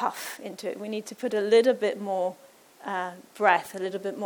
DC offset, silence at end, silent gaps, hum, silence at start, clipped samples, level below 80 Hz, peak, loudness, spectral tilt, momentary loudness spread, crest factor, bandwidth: under 0.1%; 0 s; none; none; 0 s; under 0.1%; -82 dBFS; -6 dBFS; -27 LUFS; -4 dB/octave; 15 LU; 22 dB; over 20 kHz